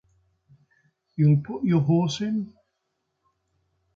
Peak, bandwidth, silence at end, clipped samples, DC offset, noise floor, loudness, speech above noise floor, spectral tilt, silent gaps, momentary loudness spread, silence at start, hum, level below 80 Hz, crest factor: -10 dBFS; 7.6 kHz; 1.5 s; under 0.1%; under 0.1%; -78 dBFS; -23 LUFS; 56 dB; -7.5 dB/octave; none; 13 LU; 1.2 s; none; -62 dBFS; 16 dB